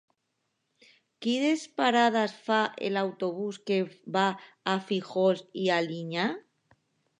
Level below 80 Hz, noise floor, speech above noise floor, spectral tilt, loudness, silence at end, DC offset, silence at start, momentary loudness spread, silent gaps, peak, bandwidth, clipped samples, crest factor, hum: -84 dBFS; -79 dBFS; 51 dB; -5 dB/octave; -28 LUFS; 0.8 s; under 0.1%; 1.2 s; 7 LU; none; -10 dBFS; 10.5 kHz; under 0.1%; 20 dB; none